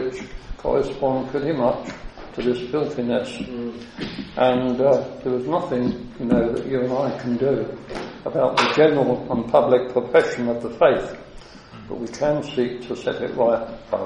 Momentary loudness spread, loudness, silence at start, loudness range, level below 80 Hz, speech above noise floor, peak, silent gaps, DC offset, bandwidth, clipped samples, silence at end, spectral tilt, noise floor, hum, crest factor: 14 LU; -22 LUFS; 0 s; 5 LU; -46 dBFS; 20 dB; -2 dBFS; none; under 0.1%; 10 kHz; under 0.1%; 0 s; -6.5 dB/octave; -41 dBFS; none; 18 dB